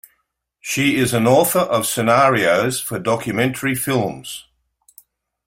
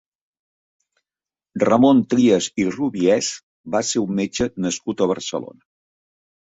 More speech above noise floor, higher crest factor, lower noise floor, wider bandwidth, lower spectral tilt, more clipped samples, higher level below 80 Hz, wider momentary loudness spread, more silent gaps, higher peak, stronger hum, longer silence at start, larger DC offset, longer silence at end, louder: second, 52 dB vs over 71 dB; about the same, 18 dB vs 18 dB; second, -70 dBFS vs under -90 dBFS; first, 16.5 kHz vs 8 kHz; about the same, -4.5 dB/octave vs -4.5 dB/octave; neither; about the same, -54 dBFS vs -56 dBFS; about the same, 11 LU vs 13 LU; second, none vs 3.43-3.64 s; about the same, -2 dBFS vs -2 dBFS; neither; second, 0.65 s vs 1.55 s; neither; about the same, 1.05 s vs 1 s; about the same, -17 LUFS vs -19 LUFS